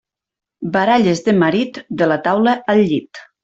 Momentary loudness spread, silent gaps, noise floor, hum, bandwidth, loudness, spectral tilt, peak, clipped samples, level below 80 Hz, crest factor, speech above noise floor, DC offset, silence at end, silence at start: 8 LU; none; -86 dBFS; none; 8 kHz; -16 LUFS; -6.5 dB/octave; -2 dBFS; under 0.1%; -56 dBFS; 14 dB; 71 dB; under 0.1%; 0.2 s; 0.6 s